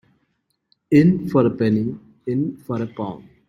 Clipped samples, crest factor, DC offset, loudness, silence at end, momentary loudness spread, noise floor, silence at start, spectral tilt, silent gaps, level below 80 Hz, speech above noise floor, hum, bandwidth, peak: under 0.1%; 18 dB; under 0.1%; -20 LUFS; 0.25 s; 14 LU; -70 dBFS; 0.9 s; -9.5 dB/octave; none; -56 dBFS; 52 dB; none; 12 kHz; -2 dBFS